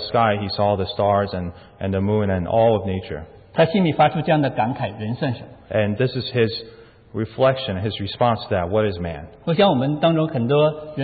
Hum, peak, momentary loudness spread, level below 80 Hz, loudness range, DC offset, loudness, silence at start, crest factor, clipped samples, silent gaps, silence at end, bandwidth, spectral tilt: none; -6 dBFS; 12 LU; -44 dBFS; 3 LU; under 0.1%; -21 LUFS; 0 s; 16 dB; under 0.1%; none; 0 s; 4.8 kHz; -11.5 dB/octave